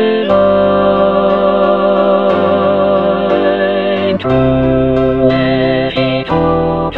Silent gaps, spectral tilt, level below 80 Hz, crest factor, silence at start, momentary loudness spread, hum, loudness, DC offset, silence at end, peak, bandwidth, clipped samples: none; -9 dB/octave; -32 dBFS; 10 dB; 0 s; 3 LU; none; -12 LUFS; 1%; 0 s; 0 dBFS; 5.2 kHz; under 0.1%